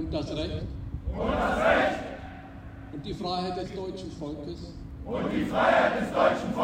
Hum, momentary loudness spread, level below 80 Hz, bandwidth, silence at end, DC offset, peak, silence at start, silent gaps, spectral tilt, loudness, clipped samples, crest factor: none; 19 LU; -42 dBFS; 15.5 kHz; 0 s; under 0.1%; -8 dBFS; 0 s; none; -6 dB/octave; -28 LUFS; under 0.1%; 20 dB